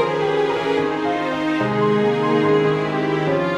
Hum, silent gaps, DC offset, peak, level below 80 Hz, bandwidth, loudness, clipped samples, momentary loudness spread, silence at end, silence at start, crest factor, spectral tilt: none; none; under 0.1%; -6 dBFS; -54 dBFS; 10 kHz; -19 LUFS; under 0.1%; 4 LU; 0 s; 0 s; 12 dB; -7 dB/octave